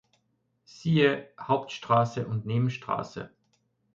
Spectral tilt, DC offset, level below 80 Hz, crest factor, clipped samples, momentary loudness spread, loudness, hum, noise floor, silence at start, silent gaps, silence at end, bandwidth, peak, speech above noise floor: -7 dB/octave; under 0.1%; -66 dBFS; 18 dB; under 0.1%; 13 LU; -28 LUFS; none; -74 dBFS; 0.75 s; none; 0.7 s; 7.6 kHz; -10 dBFS; 47 dB